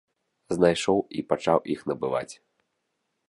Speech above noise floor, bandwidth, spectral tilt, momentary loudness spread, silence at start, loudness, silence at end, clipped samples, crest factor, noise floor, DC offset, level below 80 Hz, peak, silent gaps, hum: 53 dB; 11.5 kHz; -5.5 dB/octave; 9 LU; 0.5 s; -26 LUFS; 0.95 s; under 0.1%; 22 dB; -78 dBFS; under 0.1%; -60 dBFS; -6 dBFS; none; none